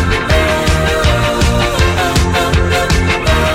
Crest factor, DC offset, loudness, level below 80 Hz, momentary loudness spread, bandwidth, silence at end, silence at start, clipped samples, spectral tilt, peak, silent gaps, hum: 10 dB; under 0.1%; -12 LUFS; -18 dBFS; 1 LU; 16 kHz; 0 s; 0 s; under 0.1%; -4.5 dB/octave; -2 dBFS; none; none